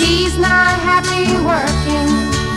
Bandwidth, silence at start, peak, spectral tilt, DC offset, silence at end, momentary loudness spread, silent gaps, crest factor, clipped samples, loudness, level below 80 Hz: 14.5 kHz; 0 s; -2 dBFS; -4 dB/octave; under 0.1%; 0 s; 4 LU; none; 12 dB; under 0.1%; -14 LUFS; -26 dBFS